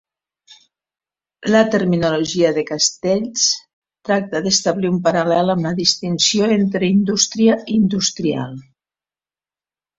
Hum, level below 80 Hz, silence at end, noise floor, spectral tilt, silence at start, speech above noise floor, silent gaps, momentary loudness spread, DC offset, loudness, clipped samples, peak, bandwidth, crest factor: none; -56 dBFS; 1.4 s; under -90 dBFS; -4 dB/octave; 1.4 s; over 73 dB; 3.73-3.82 s; 7 LU; under 0.1%; -17 LUFS; under 0.1%; -2 dBFS; 7.8 kHz; 18 dB